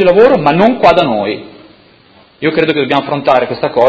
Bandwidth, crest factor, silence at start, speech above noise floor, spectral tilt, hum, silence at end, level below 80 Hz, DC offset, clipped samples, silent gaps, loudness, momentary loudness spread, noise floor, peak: 8 kHz; 10 dB; 0 s; 34 dB; -7 dB/octave; none; 0 s; -44 dBFS; under 0.1%; 0.9%; none; -11 LUFS; 9 LU; -44 dBFS; 0 dBFS